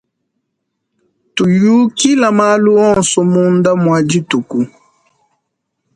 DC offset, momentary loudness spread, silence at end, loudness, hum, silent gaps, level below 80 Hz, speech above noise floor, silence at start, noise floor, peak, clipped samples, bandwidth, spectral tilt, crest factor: under 0.1%; 8 LU; 1.3 s; -12 LUFS; none; none; -52 dBFS; 61 dB; 1.35 s; -72 dBFS; 0 dBFS; under 0.1%; 11 kHz; -5 dB/octave; 14 dB